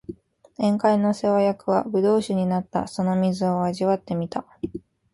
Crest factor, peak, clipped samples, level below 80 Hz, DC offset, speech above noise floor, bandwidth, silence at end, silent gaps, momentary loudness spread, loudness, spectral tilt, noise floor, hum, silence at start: 16 dB; -6 dBFS; under 0.1%; -58 dBFS; under 0.1%; 20 dB; 11.5 kHz; 0.35 s; none; 12 LU; -23 LUFS; -7.5 dB/octave; -42 dBFS; none; 0.1 s